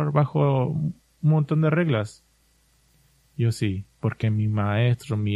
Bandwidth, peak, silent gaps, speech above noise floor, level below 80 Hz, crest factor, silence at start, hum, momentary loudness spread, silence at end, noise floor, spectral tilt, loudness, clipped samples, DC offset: 12 kHz; -8 dBFS; none; 40 dB; -56 dBFS; 16 dB; 0 s; none; 8 LU; 0 s; -63 dBFS; -8 dB/octave; -24 LUFS; under 0.1%; under 0.1%